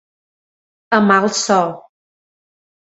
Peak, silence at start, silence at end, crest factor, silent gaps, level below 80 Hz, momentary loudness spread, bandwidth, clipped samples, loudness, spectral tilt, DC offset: 0 dBFS; 0.9 s; 1.2 s; 20 dB; none; -64 dBFS; 6 LU; 8.2 kHz; under 0.1%; -15 LUFS; -4 dB/octave; under 0.1%